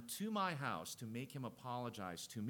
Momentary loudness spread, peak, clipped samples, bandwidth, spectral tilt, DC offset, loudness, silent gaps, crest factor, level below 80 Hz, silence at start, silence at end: 8 LU; -26 dBFS; under 0.1%; 19 kHz; -4.5 dB/octave; under 0.1%; -44 LUFS; none; 18 dB; -80 dBFS; 0 s; 0 s